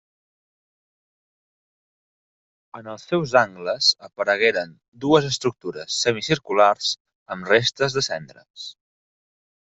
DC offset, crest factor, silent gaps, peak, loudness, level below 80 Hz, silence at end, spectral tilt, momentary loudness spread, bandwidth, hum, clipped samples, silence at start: under 0.1%; 22 dB; 4.88-4.92 s, 7.00-7.05 s, 7.15-7.26 s, 8.50-8.54 s; -2 dBFS; -21 LUFS; -62 dBFS; 0.9 s; -3.5 dB/octave; 19 LU; 8.2 kHz; none; under 0.1%; 2.75 s